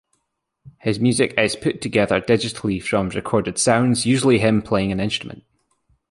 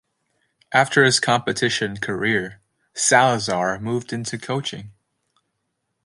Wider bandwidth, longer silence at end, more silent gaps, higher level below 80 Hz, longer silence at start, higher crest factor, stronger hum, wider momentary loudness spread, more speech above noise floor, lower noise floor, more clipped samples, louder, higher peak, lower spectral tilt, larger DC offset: about the same, 11.5 kHz vs 11.5 kHz; second, 0.75 s vs 1.15 s; neither; first, -48 dBFS vs -58 dBFS; about the same, 0.65 s vs 0.7 s; about the same, 18 dB vs 20 dB; neither; second, 8 LU vs 13 LU; about the same, 56 dB vs 55 dB; about the same, -75 dBFS vs -75 dBFS; neither; about the same, -19 LUFS vs -20 LUFS; about the same, -2 dBFS vs -2 dBFS; first, -5 dB/octave vs -3 dB/octave; neither